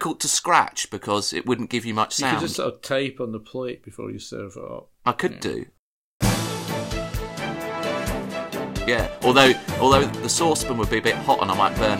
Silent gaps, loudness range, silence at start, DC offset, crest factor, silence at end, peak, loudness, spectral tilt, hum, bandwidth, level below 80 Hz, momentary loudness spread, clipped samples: 5.79-6.20 s; 9 LU; 0 s; under 0.1%; 22 dB; 0 s; -2 dBFS; -22 LUFS; -3.5 dB/octave; none; 16.5 kHz; -40 dBFS; 15 LU; under 0.1%